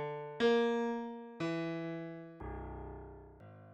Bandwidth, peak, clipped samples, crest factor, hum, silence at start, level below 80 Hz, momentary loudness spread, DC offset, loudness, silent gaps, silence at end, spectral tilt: 8.2 kHz; -20 dBFS; under 0.1%; 18 dB; none; 0 s; -56 dBFS; 22 LU; under 0.1%; -37 LUFS; none; 0 s; -6.5 dB/octave